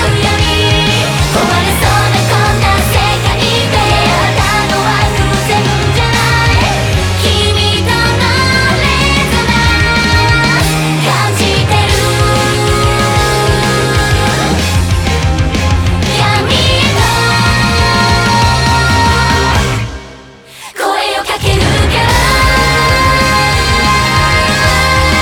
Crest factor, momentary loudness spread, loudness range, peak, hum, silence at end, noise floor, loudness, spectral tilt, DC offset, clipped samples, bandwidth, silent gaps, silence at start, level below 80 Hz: 10 dB; 3 LU; 2 LU; 0 dBFS; none; 0 s; -33 dBFS; -10 LUFS; -4 dB/octave; under 0.1%; under 0.1%; 20 kHz; none; 0 s; -20 dBFS